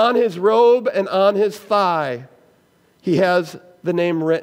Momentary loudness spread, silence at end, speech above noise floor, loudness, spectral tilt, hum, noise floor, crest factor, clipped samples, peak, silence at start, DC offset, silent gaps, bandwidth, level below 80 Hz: 13 LU; 0 s; 40 dB; -18 LUFS; -6.5 dB/octave; none; -57 dBFS; 14 dB; under 0.1%; -4 dBFS; 0 s; under 0.1%; none; 16 kHz; -72 dBFS